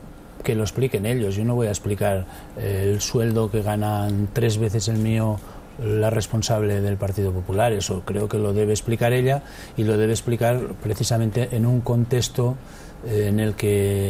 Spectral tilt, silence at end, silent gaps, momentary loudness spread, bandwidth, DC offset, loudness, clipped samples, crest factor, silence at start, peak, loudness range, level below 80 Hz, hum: -6 dB/octave; 0 s; none; 6 LU; 16 kHz; under 0.1%; -23 LUFS; under 0.1%; 14 dB; 0 s; -8 dBFS; 1 LU; -42 dBFS; none